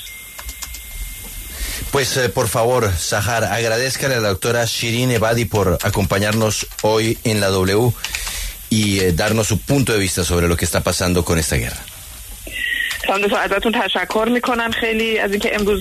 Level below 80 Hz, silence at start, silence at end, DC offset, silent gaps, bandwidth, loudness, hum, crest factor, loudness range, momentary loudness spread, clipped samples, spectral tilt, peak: -34 dBFS; 0 s; 0 s; under 0.1%; none; 14 kHz; -18 LUFS; none; 14 dB; 2 LU; 13 LU; under 0.1%; -4 dB/octave; -4 dBFS